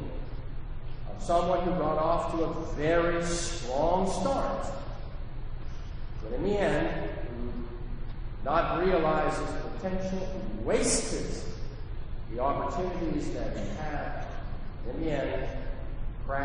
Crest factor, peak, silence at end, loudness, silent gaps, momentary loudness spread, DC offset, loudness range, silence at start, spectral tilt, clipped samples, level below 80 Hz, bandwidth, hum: 18 dB; -12 dBFS; 0 s; -31 LUFS; none; 16 LU; under 0.1%; 6 LU; 0 s; -5 dB/octave; under 0.1%; -36 dBFS; 10 kHz; none